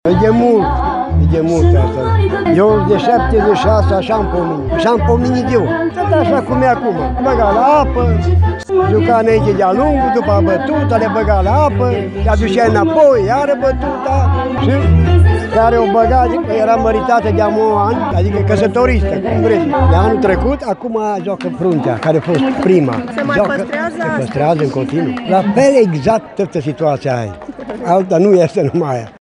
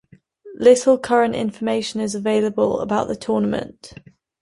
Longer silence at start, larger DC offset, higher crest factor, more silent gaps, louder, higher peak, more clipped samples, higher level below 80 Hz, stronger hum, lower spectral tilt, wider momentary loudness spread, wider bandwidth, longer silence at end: second, 0.05 s vs 0.45 s; neither; second, 12 dB vs 18 dB; neither; first, -13 LUFS vs -19 LUFS; about the same, 0 dBFS vs -2 dBFS; neither; first, -24 dBFS vs -54 dBFS; neither; first, -8 dB/octave vs -5 dB/octave; about the same, 7 LU vs 9 LU; about the same, 10.5 kHz vs 11.5 kHz; second, 0.1 s vs 0.55 s